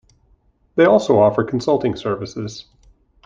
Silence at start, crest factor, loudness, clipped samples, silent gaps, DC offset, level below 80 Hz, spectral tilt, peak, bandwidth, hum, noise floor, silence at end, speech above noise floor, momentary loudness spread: 0.75 s; 18 dB; -17 LUFS; under 0.1%; none; under 0.1%; -52 dBFS; -6.5 dB/octave; 0 dBFS; 7.6 kHz; none; -58 dBFS; 0.65 s; 41 dB; 16 LU